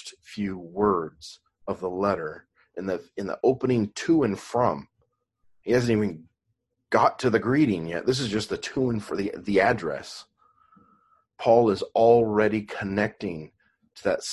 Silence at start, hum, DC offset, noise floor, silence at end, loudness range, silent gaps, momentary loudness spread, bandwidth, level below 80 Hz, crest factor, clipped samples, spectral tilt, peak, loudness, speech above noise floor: 0.05 s; none; under 0.1%; -77 dBFS; 0 s; 4 LU; none; 16 LU; 12 kHz; -56 dBFS; 20 dB; under 0.1%; -6 dB/octave; -6 dBFS; -25 LUFS; 53 dB